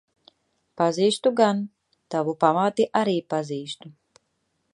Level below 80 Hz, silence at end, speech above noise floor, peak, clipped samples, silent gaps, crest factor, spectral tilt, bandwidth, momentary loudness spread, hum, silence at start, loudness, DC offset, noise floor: -74 dBFS; 0.8 s; 51 dB; -4 dBFS; under 0.1%; none; 20 dB; -5.5 dB/octave; 11.5 kHz; 12 LU; none; 0.75 s; -23 LUFS; under 0.1%; -73 dBFS